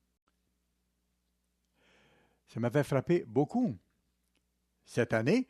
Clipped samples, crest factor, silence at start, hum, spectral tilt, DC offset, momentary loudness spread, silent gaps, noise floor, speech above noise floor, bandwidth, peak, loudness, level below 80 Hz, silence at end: under 0.1%; 20 dB; 2.55 s; 60 Hz at -60 dBFS; -7.5 dB/octave; under 0.1%; 9 LU; none; -79 dBFS; 49 dB; 13.5 kHz; -14 dBFS; -32 LUFS; -70 dBFS; 0.05 s